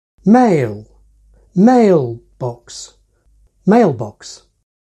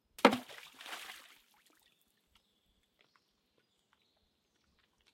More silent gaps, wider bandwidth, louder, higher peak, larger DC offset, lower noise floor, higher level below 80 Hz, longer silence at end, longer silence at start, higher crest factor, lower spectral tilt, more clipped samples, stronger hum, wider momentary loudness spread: neither; second, 9.4 kHz vs 16.5 kHz; first, -14 LUFS vs -33 LUFS; first, 0 dBFS vs -8 dBFS; neither; second, -54 dBFS vs -77 dBFS; first, -52 dBFS vs -80 dBFS; second, 0.5 s vs 4 s; about the same, 0.25 s vs 0.25 s; second, 14 dB vs 34 dB; first, -7.5 dB/octave vs -4 dB/octave; neither; neither; about the same, 22 LU vs 22 LU